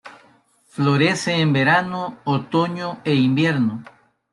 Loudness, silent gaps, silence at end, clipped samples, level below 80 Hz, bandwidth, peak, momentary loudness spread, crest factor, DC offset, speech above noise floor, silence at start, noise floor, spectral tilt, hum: -19 LUFS; none; 0.5 s; under 0.1%; -62 dBFS; 11.5 kHz; -4 dBFS; 10 LU; 18 dB; under 0.1%; 37 dB; 0.05 s; -56 dBFS; -6 dB/octave; none